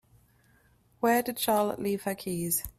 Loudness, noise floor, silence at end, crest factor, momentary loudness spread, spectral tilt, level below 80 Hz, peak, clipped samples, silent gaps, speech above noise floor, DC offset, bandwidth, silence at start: -29 LUFS; -64 dBFS; 0.1 s; 18 dB; 6 LU; -4 dB/octave; -58 dBFS; -12 dBFS; under 0.1%; none; 36 dB; under 0.1%; 16 kHz; 1 s